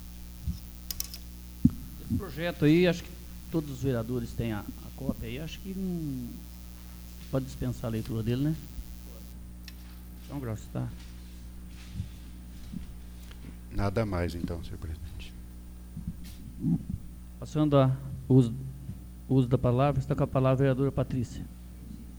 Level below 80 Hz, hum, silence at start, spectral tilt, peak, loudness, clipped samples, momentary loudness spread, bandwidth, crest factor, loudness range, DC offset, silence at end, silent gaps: -44 dBFS; 60 Hz at -45 dBFS; 0 s; -7.5 dB/octave; -6 dBFS; -30 LUFS; under 0.1%; 21 LU; over 20 kHz; 24 dB; 14 LU; under 0.1%; 0 s; none